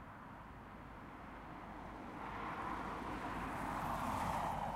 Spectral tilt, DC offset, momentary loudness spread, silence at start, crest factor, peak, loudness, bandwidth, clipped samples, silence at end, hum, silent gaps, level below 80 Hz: -5.5 dB/octave; under 0.1%; 14 LU; 0 s; 18 dB; -26 dBFS; -45 LUFS; 16 kHz; under 0.1%; 0 s; none; none; -58 dBFS